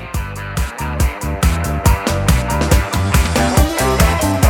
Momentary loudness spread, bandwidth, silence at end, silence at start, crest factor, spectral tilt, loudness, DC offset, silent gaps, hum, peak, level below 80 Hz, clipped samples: 8 LU; 18.5 kHz; 0 s; 0 s; 14 dB; -5 dB/octave; -16 LUFS; under 0.1%; none; none; 0 dBFS; -20 dBFS; under 0.1%